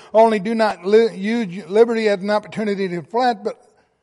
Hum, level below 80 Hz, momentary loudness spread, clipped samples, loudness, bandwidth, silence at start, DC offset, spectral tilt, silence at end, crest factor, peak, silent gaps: none; -66 dBFS; 8 LU; under 0.1%; -18 LUFS; 11.5 kHz; 0.15 s; under 0.1%; -6 dB/octave; 0.5 s; 16 dB; -2 dBFS; none